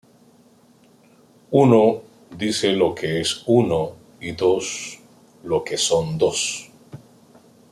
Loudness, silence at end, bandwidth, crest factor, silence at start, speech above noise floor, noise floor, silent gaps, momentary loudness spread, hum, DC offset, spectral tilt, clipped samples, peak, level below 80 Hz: -20 LUFS; 0.75 s; 14 kHz; 20 dB; 1.5 s; 34 dB; -54 dBFS; none; 17 LU; none; under 0.1%; -4.5 dB/octave; under 0.1%; -2 dBFS; -58 dBFS